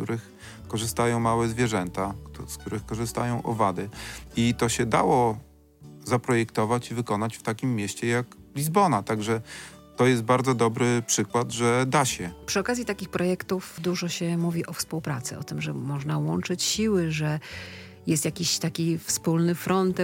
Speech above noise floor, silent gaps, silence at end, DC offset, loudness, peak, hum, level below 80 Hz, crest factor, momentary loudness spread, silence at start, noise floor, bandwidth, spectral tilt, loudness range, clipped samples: 23 dB; none; 0 s; under 0.1%; -26 LUFS; -8 dBFS; none; -54 dBFS; 18 dB; 11 LU; 0 s; -49 dBFS; 17 kHz; -5 dB/octave; 4 LU; under 0.1%